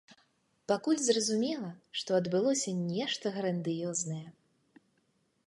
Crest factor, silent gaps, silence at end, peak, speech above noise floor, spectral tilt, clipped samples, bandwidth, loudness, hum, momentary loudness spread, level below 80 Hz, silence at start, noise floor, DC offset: 20 dB; none; 1.15 s; -14 dBFS; 43 dB; -4 dB/octave; under 0.1%; 11.5 kHz; -32 LUFS; none; 11 LU; -78 dBFS; 0.1 s; -74 dBFS; under 0.1%